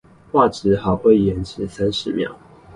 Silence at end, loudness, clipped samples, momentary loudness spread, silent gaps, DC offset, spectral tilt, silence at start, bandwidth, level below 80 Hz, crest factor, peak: 0.05 s; -19 LUFS; under 0.1%; 11 LU; none; under 0.1%; -7 dB/octave; 0.35 s; 11 kHz; -42 dBFS; 18 dB; -2 dBFS